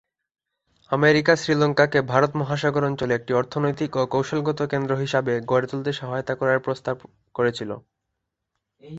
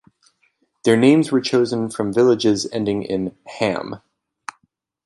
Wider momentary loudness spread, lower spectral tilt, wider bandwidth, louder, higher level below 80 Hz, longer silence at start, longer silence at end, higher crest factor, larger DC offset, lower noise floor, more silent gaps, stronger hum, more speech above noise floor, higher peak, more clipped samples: second, 9 LU vs 23 LU; about the same, -6 dB/octave vs -5.5 dB/octave; second, 8.2 kHz vs 11.5 kHz; second, -23 LUFS vs -19 LUFS; about the same, -60 dBFS vs -58 dBFS; about the same, 0.9 s vs 0.85 s; second, 0 s vs 1.1 s; about the same, 22 dB vs 18 dB; neither; first, -80 dBFS vs -67 dBFS; neither; neither; first, 58 dB vs 49 dB; about the same, -2 dBFS vs -2 dBFS; neither